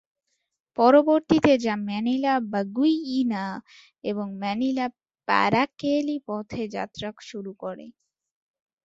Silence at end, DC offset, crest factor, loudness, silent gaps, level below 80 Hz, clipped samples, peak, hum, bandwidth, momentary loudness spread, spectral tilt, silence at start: 0.95 s; under 0.1%; 20 dB; -24 LUFS; none; -62 dBFS; under 0.1%; -4 dBFS; none; 7.8 kHz; 17 LU; -6 dB/octave; 0.8 s